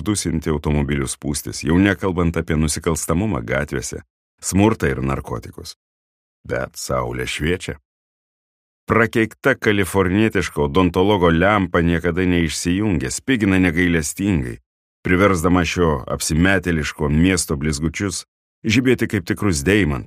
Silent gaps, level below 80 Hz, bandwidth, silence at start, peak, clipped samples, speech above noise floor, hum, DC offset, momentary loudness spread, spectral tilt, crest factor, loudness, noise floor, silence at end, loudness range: 4.10-4.38 s, 5.76-6.44 s, 7.85-8.87 s, 14.66-15.03 s, 18.28-18.62 s; -34 dBFS; 15.5 kHz; 0 s; 0 dBFS; under 0.1%; over 72 dB; none; under 0.1%; 10 LU; -5 dB/octave; 18 dB; -19 LUFS; under -90 dBFS; 0 s; 6 LU